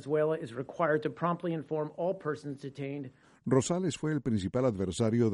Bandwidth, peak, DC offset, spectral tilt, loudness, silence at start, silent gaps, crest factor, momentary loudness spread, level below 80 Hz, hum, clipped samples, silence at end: 11.5 kHz; -14 dBFS; under 0.1%; -6.5 dB/octave; -32 LUFS; 0 s; none; 18 dB; 11 LU; -62 dBFS; none; under 0.1%; 0 s